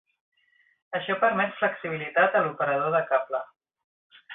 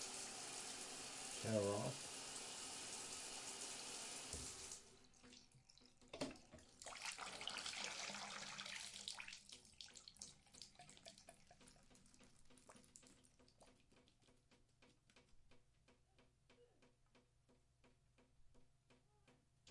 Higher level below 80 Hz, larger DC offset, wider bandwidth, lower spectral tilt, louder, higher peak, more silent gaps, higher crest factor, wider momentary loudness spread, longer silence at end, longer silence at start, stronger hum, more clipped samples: about the same, -74 dBFS vs -78 dBFS; neither; second, 4 kHz vs 11.5 kHz; first, -9 dB/octave vs -2.5 dB/octave; first, -25 LUFS vs -50 LUFS; first, -10 dBFS vs -28 dBFS; first, 3.84-4.10 s vs none; second, 18 dB vs 26 dB; second, 11 LU vs 20 LU; about the same, 0 s vs 0 s; first, 0.9 s vs 0 s; neither; neither